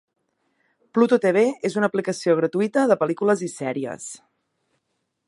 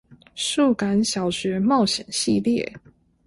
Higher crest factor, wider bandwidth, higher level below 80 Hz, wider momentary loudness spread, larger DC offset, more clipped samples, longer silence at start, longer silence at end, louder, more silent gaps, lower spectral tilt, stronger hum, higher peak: about the same, 18 dB vs 14 dB; about the same, 11.5 kHz vs 11.5 kHz; second, -74 dBFS vs -56 dBFS; first, 12 LU vs 7 LU; neither; neither; first, 0.95 s vs 0.35 s; first, 1.1 s vs 0.5 s; about the same, -21 LUFS vs -22 LUFS; neither; first, -5.5 dB/octave vs -4 dB/octave; neither; first, -4 dBFS vs -8 dBFS